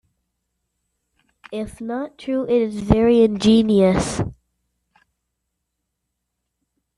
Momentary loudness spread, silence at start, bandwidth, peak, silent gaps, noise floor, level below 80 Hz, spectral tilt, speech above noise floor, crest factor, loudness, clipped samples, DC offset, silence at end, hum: 15 LU; 1.5 s; 11.5 kHz; -2 dBFS; none; -78 dBFS; -42 dBFS; -6.5 dB/octave; 60 dB; 20 dB; -18 LUFS; under 0.1%; under 0.1%; 2.65 s; none